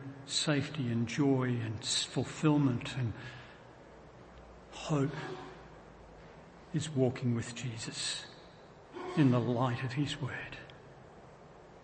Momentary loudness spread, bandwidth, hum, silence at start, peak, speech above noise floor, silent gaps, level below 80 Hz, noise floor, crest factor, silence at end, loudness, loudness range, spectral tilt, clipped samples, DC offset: 24 LU; 8.8 kHz; none; 0 s; -14 dBFS; 22 dB; none; -64 dBFS; -55 dBFS; 20 dB; 0 s; -33 LUFS; 8 LU; -5 dB/octave; under 0.1%; under 0.1%